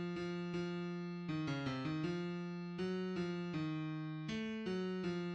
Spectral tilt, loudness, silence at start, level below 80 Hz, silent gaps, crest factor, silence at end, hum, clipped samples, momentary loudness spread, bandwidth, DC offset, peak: -7 dB/octave; -42 LUFS; 0 s; -70 dBFS; none; 12 dB; 0 s; none; under 0.1%; 3 LU; 8.4 kHz; under 0.1%; -28 dBFS